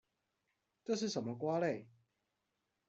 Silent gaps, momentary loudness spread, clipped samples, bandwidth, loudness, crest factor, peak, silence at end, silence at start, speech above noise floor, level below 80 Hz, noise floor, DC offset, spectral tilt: none; 9 LU; under 0.1%; 8.2 kHz; -39 LUFS; 18 dB; -24 dBFS; 1 s; 0.9 s; 48 dB; -84 dBFS; -86 dBFS; under 0.1%; -5 dB/octave